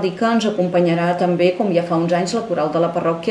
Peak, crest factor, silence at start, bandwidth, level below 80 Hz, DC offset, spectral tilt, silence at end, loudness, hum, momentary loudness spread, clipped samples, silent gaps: -4 dBFS; 14 dB; 0 s; 10.5 kHz; -62 dBFS; under 0.1%; -6.5 dB/octave; 0 s; -18 LUFS; none; 4 LU; under 0.1%; none